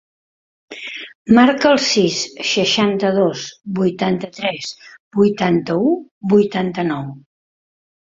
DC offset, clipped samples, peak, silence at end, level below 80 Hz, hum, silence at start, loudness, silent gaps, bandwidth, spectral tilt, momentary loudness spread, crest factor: under 0.1%; under 0.1%; 0 dBFS; 0.85 s; -58 dBFS; none; 0.7 s; -17 LUFS; 1.15-1.25 s, 5.00-5.11 s, 6.11-6.21 s; 7.8 kHz; -5 dB/octave; 16 LU; 18 dB